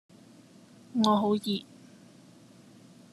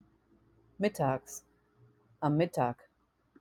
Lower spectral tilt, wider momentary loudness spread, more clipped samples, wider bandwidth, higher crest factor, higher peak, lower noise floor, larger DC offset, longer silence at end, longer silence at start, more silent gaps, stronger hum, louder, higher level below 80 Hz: about the same, -6 dB/octave vs -6.5 dB/octave; second, 11 LU vs 17 LU; neither; second, 12.5 kHz vs 17 kHz; about the same, 24 dB vs 20 dB; first, -8 dBFS vs -16 dBFS; second, -55 dBFS vs -73 dBFS; neither; first, 1.5 s vs 0.7 s; first, 0.95 s vs 0.8 s; neither; neither; first, -28 LUFS vs -33 LUFS; about the same, -74 dBFS vs -70 dBFS